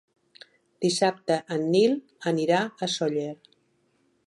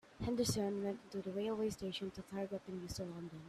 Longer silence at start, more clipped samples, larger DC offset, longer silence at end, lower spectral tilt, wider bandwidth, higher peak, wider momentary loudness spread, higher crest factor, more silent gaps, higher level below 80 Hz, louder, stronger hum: first, 0.8 s vs 0.05 s; neither; neither; first, 0.9 s vs 0 s; about the same, -4.5 dB/octave vs -5 dB/octave; second, 11.5 kHz vs 15 kHz; first, -10 dBFS vs -24 dBFS; about the same, 8 LU vs 9 LU; about the same, 18 dB vs 18 dB; neither; second, -78 dBFS vs -64 dBFS; first, -26 LUFS vs -42 LUFS; neither